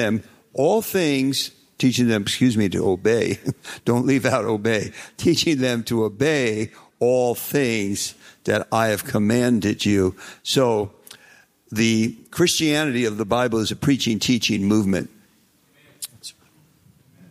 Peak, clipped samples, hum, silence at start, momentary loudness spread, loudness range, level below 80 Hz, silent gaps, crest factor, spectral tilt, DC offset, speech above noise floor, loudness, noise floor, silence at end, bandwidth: -4 dBFS; under 0.1%; none; 0 s; 11 LU; 2 LU; -56 dBFS; none; 18 dB; -4.5 dB/octave; under 0.1%; 39 dB; -21 LUFS; -59 dBFS; 1 s; 16 kHz